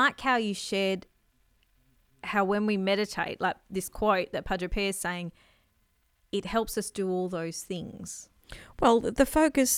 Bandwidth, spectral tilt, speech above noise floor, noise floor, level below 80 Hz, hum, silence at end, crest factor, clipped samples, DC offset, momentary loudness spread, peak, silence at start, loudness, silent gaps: 17 kHz; -4 dB/octave; 42 dB; -70 dBFS; -48 dBFS; none; 0 s; 22 dB; under 0.1%; under 0.1%; 16 LU; -6 dBFS; 0 s; -29 LUFS; none